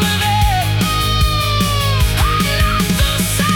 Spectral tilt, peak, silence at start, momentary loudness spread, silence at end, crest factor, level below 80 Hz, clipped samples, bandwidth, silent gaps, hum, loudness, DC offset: -4 dB/octave; -2 dBFS; 0 s; 1 LU; 0 s; 12 dB; -20 dBFS; under 0.1%; 18 kHz; none; none; -15 LUFS; under 0.1%